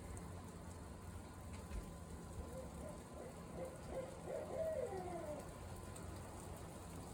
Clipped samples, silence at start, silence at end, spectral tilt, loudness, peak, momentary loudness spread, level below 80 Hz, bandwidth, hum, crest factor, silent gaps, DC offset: under 0.1%; 0 s; 0 s; -6 dB/octave; -50 LUFS; -32 dBFS; 9 LU; -58 dBFS; 17.5 kHz; none; 18 dB; none; under 0.1%